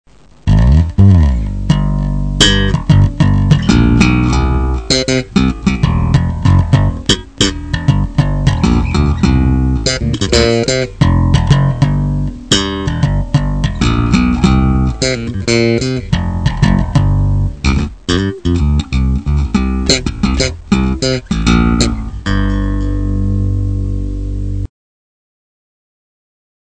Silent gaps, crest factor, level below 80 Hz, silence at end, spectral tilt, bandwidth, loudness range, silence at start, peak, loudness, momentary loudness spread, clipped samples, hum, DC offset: none; 12 dB; -18 dBFS; 2 s; -5.5 dB/octave; 11 kHz; 4 LU; 0.45 s; 0 dBFS; -13 LUFS; 7 LU; 0.4%; none; 0.6%